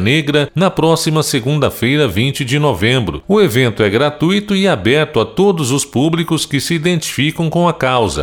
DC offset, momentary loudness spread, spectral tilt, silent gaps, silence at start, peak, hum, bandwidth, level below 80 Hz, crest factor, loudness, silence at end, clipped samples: under 0.1%; 3 LU; -5 dB/octave; none; 0 s; 0 dBFS; none; 19.5 kHz; -40 dBFS; 12 dB; -14 LUFS; 0 s; under 0.1%